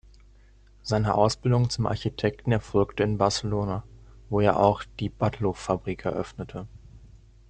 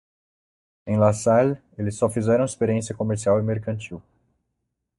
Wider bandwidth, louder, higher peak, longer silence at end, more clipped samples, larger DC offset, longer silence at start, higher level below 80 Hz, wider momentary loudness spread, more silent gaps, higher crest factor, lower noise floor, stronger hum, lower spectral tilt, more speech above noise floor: second, 9.2 kHz vs 11.5 kHz; second, -26 LUFS vs -23 LUFS; about the same, -6 dBFS vs -4 dBFS; second, 0.35 s vs 1 s; neither; neither; about the same, 0.85 s vs 0.85 s; first, -48 dBFS vs -58 dBFS; about the same, 13 LU vs 13 LU; neither; about the same, 22 dB vs 20 dB; second, -54 dBFS vs -78 dBFS; neither; about the same, -6.5 dB/octave vs -7 dB/octave; second, 29 dB vs 57 dB